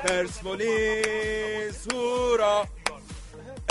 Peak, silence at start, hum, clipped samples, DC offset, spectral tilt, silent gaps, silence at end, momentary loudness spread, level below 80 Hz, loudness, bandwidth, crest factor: -6 dBFS; 0 s; none; under 0.1%; under 0.1%; -3 dB/octave; none; 0 s; 17 LU; -44 dBFS; -27 LUFS; 11.5 kHz; 22 dB